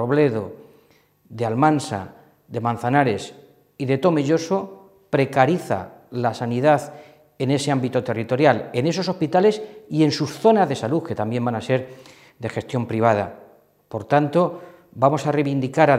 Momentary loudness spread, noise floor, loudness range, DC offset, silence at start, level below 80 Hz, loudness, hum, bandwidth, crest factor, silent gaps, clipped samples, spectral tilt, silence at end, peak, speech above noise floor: 14 LU; -58 dBFS; 4 LU; under 0.1%; 0 s; -64 dBFS; -21 LUFS; none; 15 kHz; 20 dB; none; under 0.1%; -6.5 dB/octave; 0 s; 0 dBFS; 38 dB